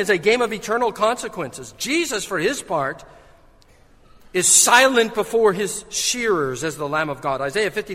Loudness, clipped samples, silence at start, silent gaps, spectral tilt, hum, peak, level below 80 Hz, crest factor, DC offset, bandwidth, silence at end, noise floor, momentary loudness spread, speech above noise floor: -19 LUFS; under 0.1%; 0 s; none; -2 dB/octave; none; 0 dBFS; -52 dBFS; 20 dB; under 0.1%; 16 kHz; 0 s; -51 dBFS; 14 LU; 31 dB